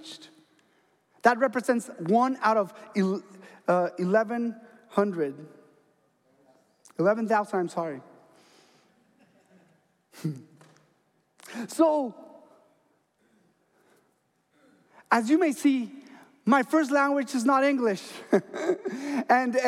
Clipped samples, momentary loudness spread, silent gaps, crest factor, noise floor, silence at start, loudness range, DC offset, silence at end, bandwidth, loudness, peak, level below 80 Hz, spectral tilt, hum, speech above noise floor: under 0.1%; 14 LU; none; 22 dB; -71 dBFS; 0 s; 11 LU; under 0.1%; 0 s; 15.5 kHz; -26 LUFS; -6 dBFS; -86 dBFS; -5.5 dB/octave; none; 46 dB